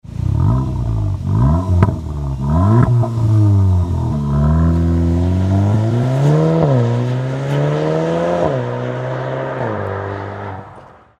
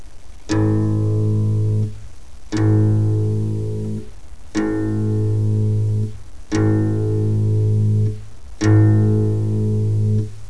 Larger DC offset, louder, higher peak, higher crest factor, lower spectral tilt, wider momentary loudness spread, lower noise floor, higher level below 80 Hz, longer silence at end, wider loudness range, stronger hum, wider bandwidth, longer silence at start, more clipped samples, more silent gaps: second, under 0.1% vs 3%; first, -16 LUFS vs -19 LUFS; first, 0 dBFS vs -4 dBFS; about the same, 16 dB vs 14 dB; about the same, -9 dB/octave vs -8.5 dB/octave; about the same, 9 LU vs 9 LU; about the same, -40 dBFS vs -38 dBFS; first, -26 dBFS vs -38 dBFS; first, 0.35 s vs 0 s; about the same, 4 LU vs 3 LU; neither; about the same, 8.8 kHz vs 8.4 kHz; about the same, 0.05 s vs 0.05 s; neither; neither